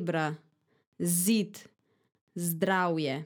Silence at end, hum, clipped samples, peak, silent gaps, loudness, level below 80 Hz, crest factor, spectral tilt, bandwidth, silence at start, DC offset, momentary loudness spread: 0 s; none; under 0.1%; -14 dBFS; 0.87-0.92 s, 2.21-2.27 s; -29 LUFS; -86 dBFS; 18 dB; -4.5 dB/octave; over 20 kHz; 0 s; under 0.1%; 19 LU